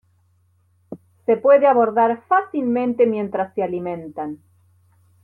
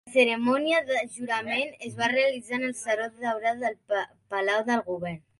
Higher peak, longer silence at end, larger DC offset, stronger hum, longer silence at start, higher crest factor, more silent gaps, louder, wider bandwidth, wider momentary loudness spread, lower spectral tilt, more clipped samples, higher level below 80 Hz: first, -4 dBFS vs -10 dBFS; first, 0.9 s vs 0.2 s; neither; neither; first, 0.9 s vs 0.05 s; about the same, 16 dB vs 18 dB; neither; first, -19 LUFS vs -27 LUFS; second, 4.2 kHz vs 11.5 kHz; first, 20 LU vs 8 LU; first, -9 dB/octave vs -3.5 dB/octave; neither; about the same, -66 dBFS vs -70 dBFS